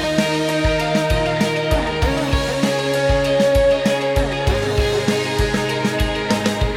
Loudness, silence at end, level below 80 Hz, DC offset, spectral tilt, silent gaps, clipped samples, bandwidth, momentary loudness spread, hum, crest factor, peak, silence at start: -18 LUFS; 0 s; -26 dBFS; under 0.1%; -5 dB/octave; none; under 0.1%; 16.5 kHz; 4 LU; none; 16 dB; -2 dBFS; 0 s